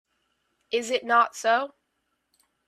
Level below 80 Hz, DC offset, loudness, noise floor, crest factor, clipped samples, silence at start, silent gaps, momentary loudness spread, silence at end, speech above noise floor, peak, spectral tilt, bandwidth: -80 dBFS; under 0.1%; -24 LUFS; -76 dBFS; 20 dB; under 0.1%; 0.7 s; none; 9 LU; 1 s; 53 dB; -8 dBFS; -1 dB/octave; 13.5 kHz